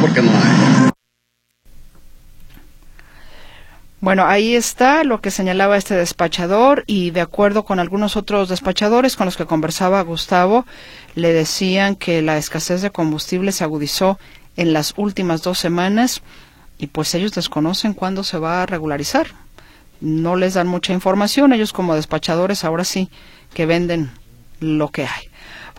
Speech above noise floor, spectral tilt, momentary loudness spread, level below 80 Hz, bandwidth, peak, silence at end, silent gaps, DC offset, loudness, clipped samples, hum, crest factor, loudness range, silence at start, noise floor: 53 dB; -5 dB/octave; 10 LU; -44 dBFS; 16.5 kHz; 0 dBFS; 0 s; none; under 0.1%; -17 LUFS; under 0.1%; none; 18 dB; 5 LU; 0 s; -70 dBFS